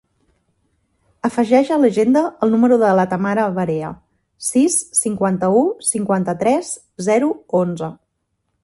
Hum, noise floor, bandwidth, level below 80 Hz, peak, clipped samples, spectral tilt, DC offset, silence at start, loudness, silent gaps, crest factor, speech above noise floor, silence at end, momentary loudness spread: none; -72 dBFS; 12 kHz; -58 dBFS; 0 dBFS; under 0.1%; -5.5 dB/octave; under 0.1%; 1.25 s; -17 LUFS; none; 16 dB; 55 dB; 0.7 s; 10 LU